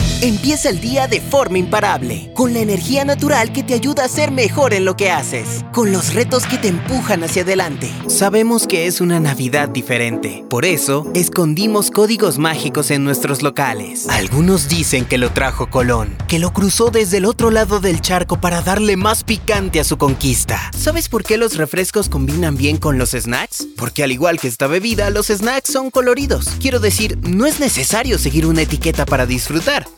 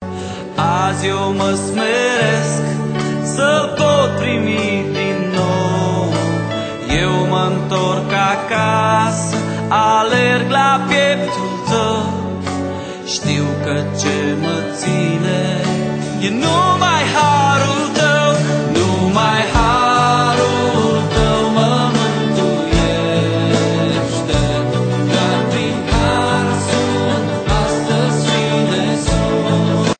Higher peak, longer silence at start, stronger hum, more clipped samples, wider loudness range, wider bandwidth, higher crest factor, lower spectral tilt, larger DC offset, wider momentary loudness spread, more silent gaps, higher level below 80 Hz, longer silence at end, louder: about the same, 0 dBFS vs -2 dBFS; about the same, 0 s vs 0 s; neither; neither; about the same, 2 LU vs 4 LU; first, over 20 kHz vs 9.2 kHz; about the same, 14 dB vs 14 dB; about the same, -4.5 dB/octave vs -5 dB/octave; neither; about the same, 4 LU vs 6 LU; neither; about the same, -30 dBFS vs -32 dBFS; about the same, 0.05 s vs 0.05 s; about the same, -15 LUFS vs -15 LUFS